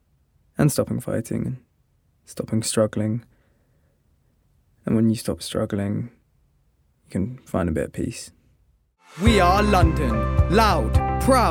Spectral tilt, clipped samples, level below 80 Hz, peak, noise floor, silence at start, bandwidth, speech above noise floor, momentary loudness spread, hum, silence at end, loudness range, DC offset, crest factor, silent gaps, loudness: -6 dB/octave; under 0.1%; -32 dBFS; -2 dBFS; -64 dBFS; 0.6 s; 18 kHz; 43 dB; 15 LU; none; 0 s; 8 LU; under 0.1%; 20 dB; none; -22 LUFS